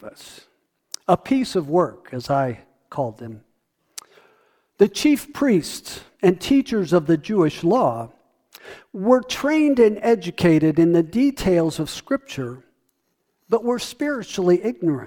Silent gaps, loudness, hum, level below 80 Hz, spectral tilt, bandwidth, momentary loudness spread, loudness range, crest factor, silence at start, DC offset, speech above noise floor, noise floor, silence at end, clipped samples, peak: none; -20 LUFS; none; -52 dBFS; -6 dB/octave; 19 kHz; 17 LU; 6 LU; 20 dB; 0.05 s; under 0.1%; 52 dB; -72 dBFS; 0 s; under 0.1%; -2 dBFS